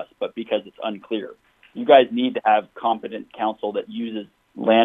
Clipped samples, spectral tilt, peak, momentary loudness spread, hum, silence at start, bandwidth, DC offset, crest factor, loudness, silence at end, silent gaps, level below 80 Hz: under 0.1%; -7 dB/octave; 0 dBFS; 18 LU; none; 0 s; 3.9 kHz; under 0.1%; 22 dB; -22 LUFS; 0 s; none; -74 dBFS